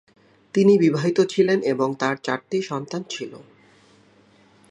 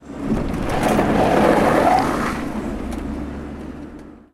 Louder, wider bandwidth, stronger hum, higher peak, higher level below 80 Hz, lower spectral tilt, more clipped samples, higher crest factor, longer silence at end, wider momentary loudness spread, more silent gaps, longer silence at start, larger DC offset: about the same, -21 LUFS vs -19 LUFS; second, 10 kHz vs 16.5 kHz; neither; about the same, -4 dBFS vs -2 dBFS; second, -70 dBFS vs -34 dBFS; about the same, -6 dB/octave vs -6 dB/octave; neither; about the same, 18 dB vs 16 dB; first, 1.3 s vs 0.15 s; second, 13 LU vs 18 LU; neither; first, 0.55 s vs 0 s; neither